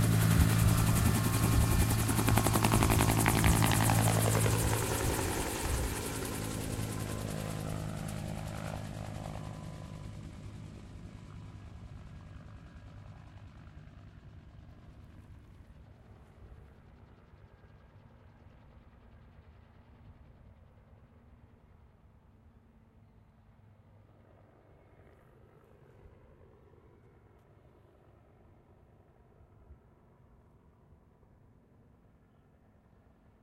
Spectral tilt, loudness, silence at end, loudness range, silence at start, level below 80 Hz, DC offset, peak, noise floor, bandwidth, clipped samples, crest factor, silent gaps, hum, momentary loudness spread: -5 dB/octave; -31 LUFS; 3.7 s; 27 LU; 0 s; -44 dBFS; under 0.1%; -6 dBFS; -64 dBFS; 16 kHz; under 0.1%; 28 dB; none; none; 27 LU